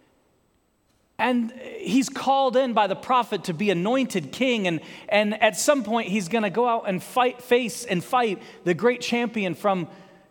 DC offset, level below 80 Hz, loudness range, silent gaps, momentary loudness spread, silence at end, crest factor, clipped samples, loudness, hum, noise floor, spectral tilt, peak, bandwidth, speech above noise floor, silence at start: under 0.1%; -70 dBFS; 1 LU; none; 7 LU; 0.3 s; 20 dB; under 0.1%; -24 LUFS; none; -66 dBFS; -4.5 dB/octave; -4 dBFS; 19 kHz; 43 dB; 1.2 s